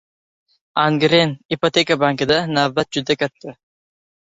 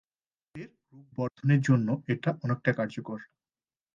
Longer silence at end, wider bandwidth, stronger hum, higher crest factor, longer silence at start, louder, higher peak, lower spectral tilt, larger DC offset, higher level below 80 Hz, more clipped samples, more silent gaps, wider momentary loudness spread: about the same, 0.8 s vs 0.7 s; about the same, 8 kHz vs 7.4 kHz; neither; about the same, 18 dB vs 20 dB; first, 0.75 s vs 0.55 s; first, -18 LUFS vs -29 LUFS; first, -2 dBFS vs -10 dBFS; second, -5 dB/octave vs -8 dB/octave; neither; first, -56 dBFS vs -72 dBFS; neither; first, 1.45-1.49 s vs none; second, 10 LU vs 21 LU